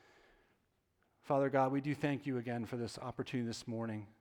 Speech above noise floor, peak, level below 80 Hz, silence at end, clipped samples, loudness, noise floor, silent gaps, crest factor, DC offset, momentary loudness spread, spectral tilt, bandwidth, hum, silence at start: 41 dB; -18 dBFS; -74 dBFS; 0.1 s; under 0.1%; -38 LUFS; -78 dBFS; none; 20 dB; under 0.1%; 9 LU; -6.5 dB/octave; 15.5 kHz; none; 1.25 s